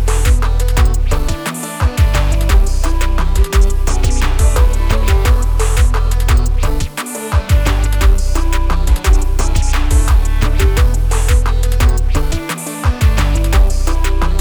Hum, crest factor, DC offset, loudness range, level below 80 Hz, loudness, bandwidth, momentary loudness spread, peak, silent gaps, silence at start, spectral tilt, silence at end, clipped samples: none; 10 dB; under 0.1%; 1 LU; -12 dBFS; -15 LUFS; over 20 kHz; 5 LU; 0 dBFS; none; 0 s; -5 dB/octave; 0 s; under 0.1%